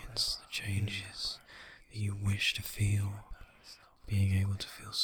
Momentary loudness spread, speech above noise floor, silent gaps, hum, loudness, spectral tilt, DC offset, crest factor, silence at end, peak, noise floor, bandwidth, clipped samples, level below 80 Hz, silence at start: 22 LU; 24 dB; none; none; -34 LUFS; -4 dB/octave; under 0.1%; 16 dB; 0 s; -18 dBFS; -57 dBFS; 19 kHz; under 0.1%; -52 dBFS; 0 s